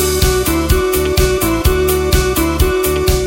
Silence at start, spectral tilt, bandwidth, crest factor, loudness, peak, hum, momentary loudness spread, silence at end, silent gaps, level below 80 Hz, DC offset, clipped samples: 0 s; -4.5 dB/octave; 17 kHz; 12 dB; -14 LUFS; 0 dBFS; none; 1 LU; 0 s; none; -18 dBFS; under 0.1%; under 0.1%